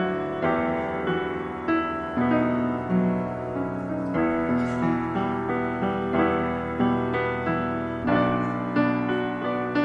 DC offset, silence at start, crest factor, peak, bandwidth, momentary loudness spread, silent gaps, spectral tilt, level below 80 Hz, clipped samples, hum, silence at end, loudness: under 0.1%; 0 s; 16 dB; -10 dBFS; 7.8 kHz; 5 LU; none; -8.5 dB/octave; -50 dBFS; under 0.1%; none; 0 s; -25 LUFS